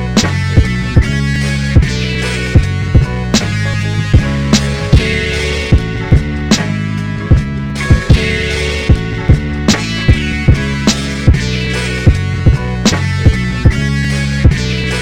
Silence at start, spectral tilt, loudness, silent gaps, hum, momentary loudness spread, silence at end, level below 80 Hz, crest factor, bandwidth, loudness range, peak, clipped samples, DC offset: 0 s; -5.5 dB/octave; -13 LUFS; none; none; 3 LU; 0 s; -18 dBFS; 12 dB; 14.5 kHz; 1 LU; 0 dBFS; 0.6%; under 0.1%